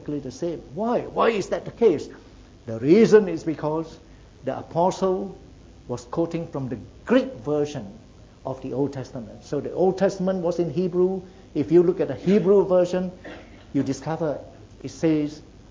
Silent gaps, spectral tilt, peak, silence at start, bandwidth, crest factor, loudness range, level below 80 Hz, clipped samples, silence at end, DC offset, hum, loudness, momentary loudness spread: none; -7 dB/octave; -2 dBFS; 0 s; 7.8 kHz; 20 dB; 6 LU; -52 dBFS; under 0.1%; 0.3 s; under 0.1%; none; -23 LUFS; 18 LU